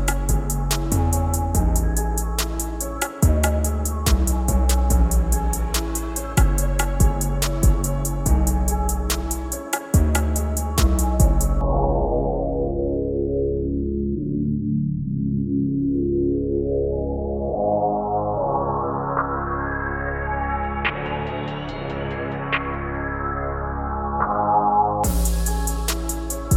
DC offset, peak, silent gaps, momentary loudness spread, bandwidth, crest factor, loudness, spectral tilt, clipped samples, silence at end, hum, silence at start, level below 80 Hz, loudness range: under 0.1%; -4 dBFS; none; 7 LU; 16.5 kHz; 18 dB; -22 LUFS; -5.5 dB/octave; under 0.1%; 0 s; none; 0 s; -24 dBFS; 4 LU